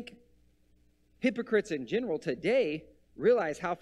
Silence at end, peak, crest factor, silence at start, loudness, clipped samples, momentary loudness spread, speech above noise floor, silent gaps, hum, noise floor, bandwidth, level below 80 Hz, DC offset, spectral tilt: 0.05 s; -14 dBFS; 18 dB; 0 s; -30 LUFS; under 0.1%; 7 LU; 38 dB; none; 60 Hz at -60 dBFS; -67 dBFS; 11 kHz; -66 dBFS; under 0.1%; -6 dB/octave